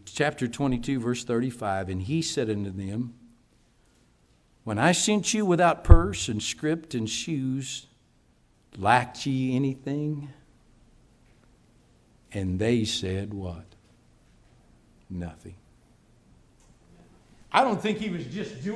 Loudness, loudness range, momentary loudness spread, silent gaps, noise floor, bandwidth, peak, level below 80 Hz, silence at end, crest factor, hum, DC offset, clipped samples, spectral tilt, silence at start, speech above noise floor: -27 LUFS; 13 LU; 15 LU; none; -63 dBFS; 11 kHz; 0 dBFS; -34 dBFS; 0 s; 28 dB; none; under 0.1%; under 0.1%; -5 dB/octave; 0.05 s; 37 dB